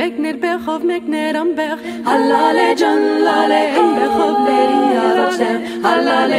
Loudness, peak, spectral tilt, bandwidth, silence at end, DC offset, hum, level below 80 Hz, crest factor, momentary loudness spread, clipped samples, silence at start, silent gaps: -15 LUFS; -2 dBFS; -4 dB/octave; 15.5 kHz; 0 s; under 0.1%; none; -58 dBFS; 14 dB; 6 LU; under 0.1%; 0 s; none